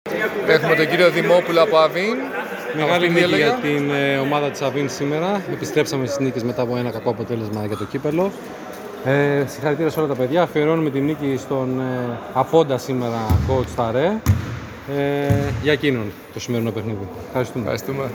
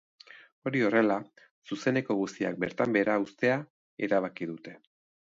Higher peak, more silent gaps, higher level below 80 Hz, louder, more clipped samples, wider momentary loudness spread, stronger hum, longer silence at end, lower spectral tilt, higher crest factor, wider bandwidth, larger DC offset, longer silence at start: first, 0 dBFS vs -10 dBFS; second, none vs 0.52-0.62 s, 1.51-1.62 s, 3.70-3.97 s; first, -44 dBFS vs -72 dBFS; first, -20 LUFS vs -29 LUFS; neither; second, 10 LU vs 13 LU; neither; second, 0 s vs 0.55 s; about the same, -6 dB/octave vs -6.5 dB/octave; about the same, 20 dB vs 20 dB; first, over 20 kHz vs 7.8 kHz; neither; second, 0.05 s vs 0.35 s